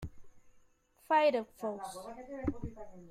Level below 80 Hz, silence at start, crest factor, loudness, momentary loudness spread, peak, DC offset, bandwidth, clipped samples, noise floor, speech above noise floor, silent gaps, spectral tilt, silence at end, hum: -56 dBFS; 0 s; 20 dB; -34 LUFS; 18 LU; -16 dBFS; under 0.1%; 15.5 kHz; under 0.1%; -66 dBFS; 32 dB; none; -5.5 dB/octave; 0 s; none